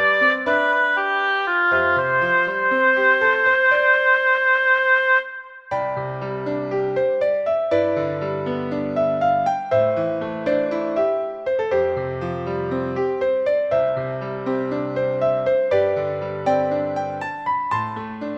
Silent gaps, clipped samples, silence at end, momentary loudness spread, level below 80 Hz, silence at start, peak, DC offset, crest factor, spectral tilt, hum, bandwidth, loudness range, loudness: none; under 0.1%; 0 s; 10 LU; -58 dBFS; 0 s; -6 dBFS; under 0.1%; 14 dB; -6.5 dB/octave; none; 7.8 kHz; 6 LU; -20 LUFS